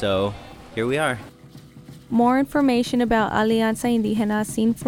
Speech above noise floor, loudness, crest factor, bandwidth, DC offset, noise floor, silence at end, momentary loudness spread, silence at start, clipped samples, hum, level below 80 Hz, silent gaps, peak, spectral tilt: 24 dB; -21 LUFS; 14 dB; 16.5 kHz; under 0.1%; -44 dBFS; 0 s; 8 LU; 0 s; under 0.1%; none; -46 dBFS; none; -6 dBFS; -5.5 dB/octave